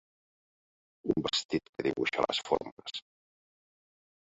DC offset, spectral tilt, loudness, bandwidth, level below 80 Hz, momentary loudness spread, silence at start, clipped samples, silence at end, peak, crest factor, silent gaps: under 0.1%; -4 dB/octave; -33 LUFS; 8 kHz; -66 dBFS; 12 LU; 1.05 s; under 0.1%; 1.35 s; -10 dBFS; 24 dB; 1.45-1.49 s, 1.69-1.73 s, 2.72-2.77 s